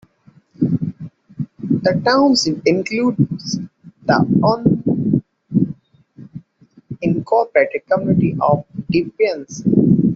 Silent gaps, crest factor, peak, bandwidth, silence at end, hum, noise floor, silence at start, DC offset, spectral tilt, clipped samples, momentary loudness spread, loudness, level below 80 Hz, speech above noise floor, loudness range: none; 16 dB; -2 dBFS; 8 kHz; 0 s; none; -51 dBFS; 0.6 s; under 0.1%; -6 dB/octave; under 0.1%; 16 LU; -17 LUFS; -52 dBFS; 36 dB; 3 LU